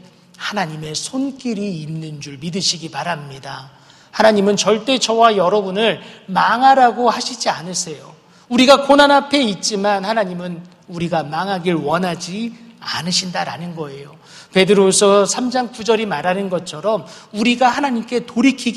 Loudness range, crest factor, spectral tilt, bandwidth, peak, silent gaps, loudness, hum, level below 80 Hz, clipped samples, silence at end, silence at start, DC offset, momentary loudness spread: 7 LU; 18 dB; -3.5 dB/octave; 13.5 kHz; 0 dBFS; none; -16 LUFS; none; -58 dBFS; under 0.1%; 0 s; 0.4 s; under 0.1%; 17 LU